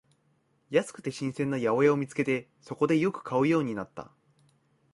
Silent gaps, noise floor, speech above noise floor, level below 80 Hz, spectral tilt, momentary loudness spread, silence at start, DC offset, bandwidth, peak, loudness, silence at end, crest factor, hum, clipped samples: none; -70 dBFS; 42 dB; -70 dBFS; -6.5 dB/octave; 13 LU; 0.7 s; under 0.1%; 11.5 kHz; -10 dBFS; -28 LUFS; 0.9 s; 18 dB; none; under 0.1%